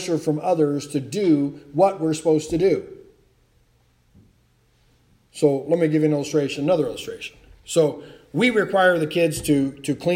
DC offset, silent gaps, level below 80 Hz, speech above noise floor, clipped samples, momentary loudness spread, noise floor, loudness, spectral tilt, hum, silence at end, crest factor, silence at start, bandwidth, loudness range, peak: under 0.1%; none; -54 dBFS; 40 dB; under 0.1%; 11 LU; -61 dBFS; -21 LUFS; -5.5 dB/octave; none; 0 s; 18 dB; 0 s; 16 kHz; 5 LU; -4 dBFS